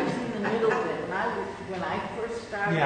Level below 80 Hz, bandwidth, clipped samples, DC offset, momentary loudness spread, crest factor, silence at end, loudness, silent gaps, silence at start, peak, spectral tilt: -58 dBFS; 9.6 kHz; under 0.1%; under 0.1%; 8 LU; 20 dB; 0 s; -29 LUFS; none; 0 s; -10 dBFS; -6 dB/octave